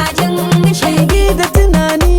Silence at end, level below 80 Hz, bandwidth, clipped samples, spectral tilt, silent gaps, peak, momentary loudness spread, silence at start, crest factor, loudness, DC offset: 0 s; -16 dBFS; 17.5 kHz; under 0.1%; -5.5 dB/octave; none; 0 dBFS; 2 LU; 0 s; 10 dB; -12 LUFS; under 0.1%